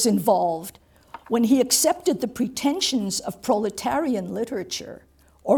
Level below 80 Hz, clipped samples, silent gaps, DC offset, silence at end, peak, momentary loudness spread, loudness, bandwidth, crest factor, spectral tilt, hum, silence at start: -58 dBFS; under 0.1%; none; under 0.1%; 0 s; -6 dBFS; 13 LU; -23 LUFS; 19.5 kHz; 18 dB; -3.5 dB/octave; none; 0 s